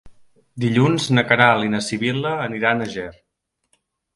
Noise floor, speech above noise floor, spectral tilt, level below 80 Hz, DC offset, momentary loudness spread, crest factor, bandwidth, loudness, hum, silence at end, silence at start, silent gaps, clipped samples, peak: -68 dBFS; 50 dB; -5.5 dB/octave; -54 dBFS; under 0.1%; 12 LU; 20 dB; 11.5 kHz; -19 LUFS; none; 1.05 s; 0.05 s; none; under 0.1%; 0 dBFS